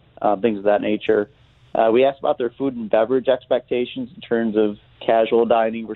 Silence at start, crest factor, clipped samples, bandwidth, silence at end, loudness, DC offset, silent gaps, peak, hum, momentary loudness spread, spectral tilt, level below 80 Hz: 0.2 s; 16 dB; under 0.1%; 4.2 kHz; 0 s; -20 LUFS; under 0.1%; none; -2 dBFS; none; 8 LU; -9 dB/octave; -58 dBFS